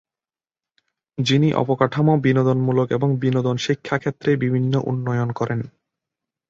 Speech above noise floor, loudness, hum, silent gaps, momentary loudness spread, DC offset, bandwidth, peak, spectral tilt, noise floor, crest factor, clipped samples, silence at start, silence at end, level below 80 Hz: over 71 dB; -20 LUFS; none; none; 7 LU; under 0.1%; 7.6 kHz; -4 dBFS; -7 dB/octave; under -90 dBFS; 18 dB; under 0.1%; 1.2 s; 0.8 s; -58 dBFS